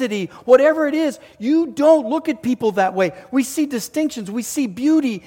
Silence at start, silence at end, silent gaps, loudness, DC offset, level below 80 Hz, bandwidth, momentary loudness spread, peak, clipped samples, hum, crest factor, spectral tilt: 0 s; 0.05 s; none; -18 LUFS; under 0.1%; -62 dBFS; 17 kHz; 10 LU; 0 dBFS; under 0.1%; none; 18 dB; -5 dB/octave